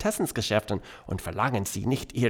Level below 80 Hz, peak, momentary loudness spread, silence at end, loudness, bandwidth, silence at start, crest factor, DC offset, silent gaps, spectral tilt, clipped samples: -50 dBFS; -10 dBFS; 8 LU; 0 s; -29 LUFS; 19.5 kHz; 0 s; 18 dB; under 0.1%; none; -5 dB/octave; under 0.1%